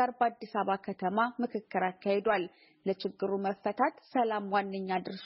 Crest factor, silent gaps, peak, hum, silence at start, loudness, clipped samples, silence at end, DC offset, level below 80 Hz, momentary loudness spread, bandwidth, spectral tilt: 18 dB; none; -14 dBFS; none; 0 s; -32 LUFS; under 0.1%; 0 s; under 0.1%; -78 dBFS; 5 LU; 5.8 kHz; -4 dB/octave